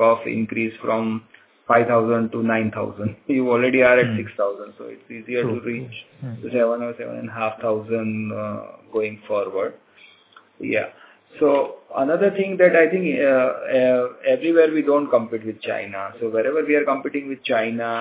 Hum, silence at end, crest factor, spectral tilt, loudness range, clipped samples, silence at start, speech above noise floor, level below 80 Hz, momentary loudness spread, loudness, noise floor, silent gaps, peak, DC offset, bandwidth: none; 0 s; 18 dB; -10 dB/octave; 8 LU; under 0.1%; 0 s; 31 dB; -62 dBFS; 14 LU; -21 LUFS; -52 dBFS; none; -2 dBFS; under 0.1%; 4 kHz